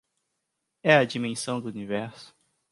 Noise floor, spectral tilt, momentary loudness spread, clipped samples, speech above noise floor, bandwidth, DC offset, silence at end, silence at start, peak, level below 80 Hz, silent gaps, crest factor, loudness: -80 dBFS; -5 dB/octave; 12 LU; under 0.1%; 55 dB; 11.5 kHz; under 0.1%; 0.45 s; 0.85 s; -4 dBFS; -70 dBFS; none; 24 dB; -26 LUFS